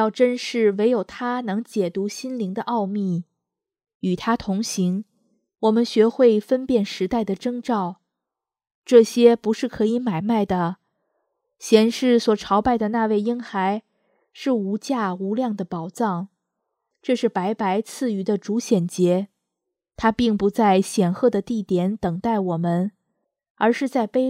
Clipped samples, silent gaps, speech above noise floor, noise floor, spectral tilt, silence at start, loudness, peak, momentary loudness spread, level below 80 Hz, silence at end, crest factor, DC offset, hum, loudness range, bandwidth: under 0.1%; 3.95-4.00 s, 8.75-8.82 s, 23.50-23.55 s; 66 dB; -86 dBFS; -6 dB/octave; 0 s; -22 LUFS; 0 dBFS; 10 LU; -56 dBFS; 0 s; 20 dB; under 0.1%; none; 5 LU; 14.5 kHz